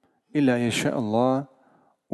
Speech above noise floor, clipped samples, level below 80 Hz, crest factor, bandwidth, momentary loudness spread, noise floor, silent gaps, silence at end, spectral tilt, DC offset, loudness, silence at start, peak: 39 dB; under 0.1%; -64 dBFS; 16 dB; 12.5 kHz; 8 LU; -61 dBFS; none; 0.7 s; -5.5 dB/octave; under 0.1%; -24 LUFS; 0.35 s; -8 dBFS